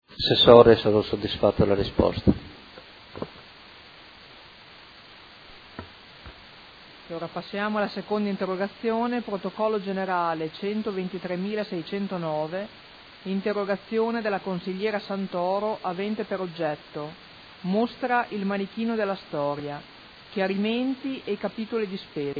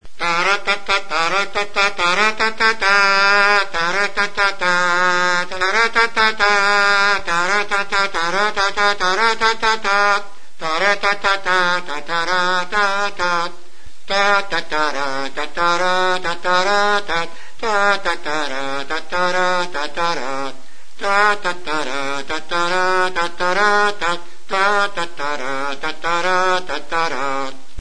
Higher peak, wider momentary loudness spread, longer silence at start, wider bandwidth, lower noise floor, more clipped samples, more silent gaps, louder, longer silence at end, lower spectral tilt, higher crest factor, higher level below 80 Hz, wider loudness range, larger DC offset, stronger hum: about the same, 0 dBFS vs 0 dBFS; first, 23 LU vs 9 LU; about the same, 0.1 s vs 0 s; second, 5 kHz vs 10.5 kHz; first, -49 dBFS vs -44 dBFS; neither; neither; second, -25 LUFS vs -17 LUFS; about the same, 0 s vs 0 s; first, -8 dB/octave vs -2 dB/octave; first, 26 dB vs 18 dB; about the same, -50 dBFS vs -48 dBFS; first, 15 LU vs 5 LU; second, under 0.1% vs 8%; neither